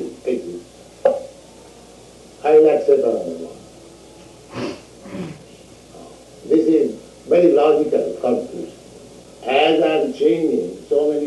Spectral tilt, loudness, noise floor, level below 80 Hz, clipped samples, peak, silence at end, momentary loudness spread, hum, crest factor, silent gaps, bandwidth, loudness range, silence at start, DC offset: -5.5 dB/octave; -18 LUFS; -43 dBFS; -56 dBFS; under 0.1%; -4 dBFS; 0 s; 21 LU; none; 16 dB; none; 11.5 kHz; 7 LU; 0 s; under 0.1%